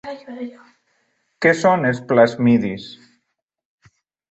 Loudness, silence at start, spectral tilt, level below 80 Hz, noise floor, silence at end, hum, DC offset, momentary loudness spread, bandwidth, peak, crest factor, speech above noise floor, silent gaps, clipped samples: -17 LUFS; 0.05 s; -6.5 dB/octave; -60 dBFS; -74 dBFS; 1.35 s; none; under 0.1%; 19 LU; 8.2 kHz; -2 dBFS; 18 dB; 57 dB; none; under 0.1%